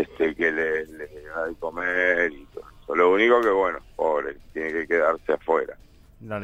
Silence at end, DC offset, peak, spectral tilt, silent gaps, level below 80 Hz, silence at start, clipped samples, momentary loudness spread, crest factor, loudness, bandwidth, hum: 0 s; under 0.1%; -6 dBFS; -5.5 dB/octave; none; -52 dBFS; 0 s; under 0.1%; 17 LU; 18 dB; -23 LUFS; 8.6 kHz; none